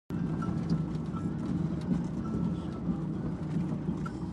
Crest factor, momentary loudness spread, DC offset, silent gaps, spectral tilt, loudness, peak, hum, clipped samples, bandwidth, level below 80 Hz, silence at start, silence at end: 14 dB; 3 LU; under 0.1%; none; -9 dB/octave; -33 LUFS; -18 dBFS; none; under 0.1%; 9.4 kHz; -48 dBFS; 0.1 s; 0 s